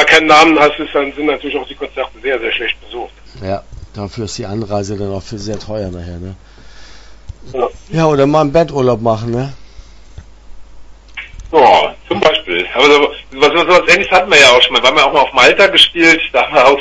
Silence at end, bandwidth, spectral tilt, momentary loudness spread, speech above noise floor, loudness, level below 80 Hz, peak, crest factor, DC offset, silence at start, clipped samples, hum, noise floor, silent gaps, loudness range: 0 s; 11 kHz; -3.5 dB/octave; 19 LU; 23 dB; -10 LUFS; -38 dBFS; 0 dBFS; 12 dB; under 0.1%; 0 s; 0.4%; none; -35 dBFS; none; 15 LU